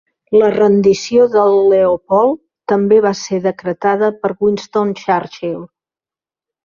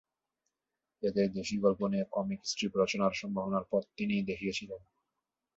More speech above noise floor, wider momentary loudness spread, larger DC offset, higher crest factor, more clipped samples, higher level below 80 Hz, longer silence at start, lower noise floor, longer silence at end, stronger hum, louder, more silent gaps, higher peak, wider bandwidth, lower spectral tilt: first, over 77 dB vs 56 dB; about the same, 8 LU vs 7 LU; neither; second, 12 dB vs 20 dB; neither; first, -56 dBFS vs -66 dBFS; second, 0.3 s vs 1 s; about the same, under -90 dBFS vs -89 dBFS; first, 1 s vs 0.8 s; neither; first, -14 LUFS vs -33 LUFS; neither; first, -2 dBFS vs -14 dBFS; about the same, 7.4 kHz vs 8 kHz; about the same, -6 dB/octave vs -5 dB/octave